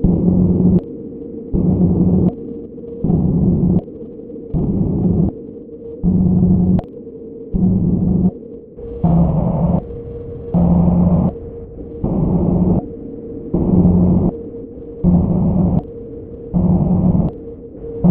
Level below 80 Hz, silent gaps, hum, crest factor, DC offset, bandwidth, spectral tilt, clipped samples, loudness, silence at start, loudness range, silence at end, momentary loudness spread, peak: -28 dBFS; none; none; 16 dB; under 0.1%; 1.5 kHz; -15.5 dB/octave; under 0.1%; -16 LUFS; 0 s; 1 LU; 0 s; 18 LU; 0 dBFS